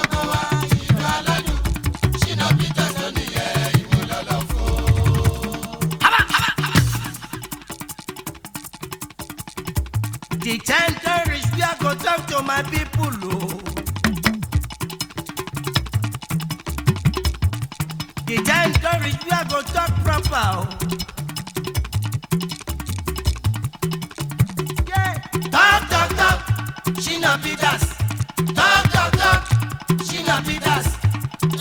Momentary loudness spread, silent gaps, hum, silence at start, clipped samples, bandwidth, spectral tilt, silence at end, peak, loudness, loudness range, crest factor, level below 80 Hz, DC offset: 12 LU; none; none; 0 s; under 0.1%; 19.5 kHz; -4.5 dB/octave; 0 s; 0 dBFS; -20 LUFS; 6 LU; 20 dB; -32 dBFS; under 0.1%